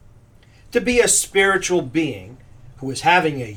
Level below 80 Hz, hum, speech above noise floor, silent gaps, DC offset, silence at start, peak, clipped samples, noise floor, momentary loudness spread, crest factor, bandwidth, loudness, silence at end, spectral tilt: -46 dBFS; none; 30 dB; none; under 0.1%; 0.75 s; -2 dBFS; under 0.1%; -49 dBFS; 13 LU; 18 dB; 19 kHz; -18 LUFS; 0 s; -3 dB/octave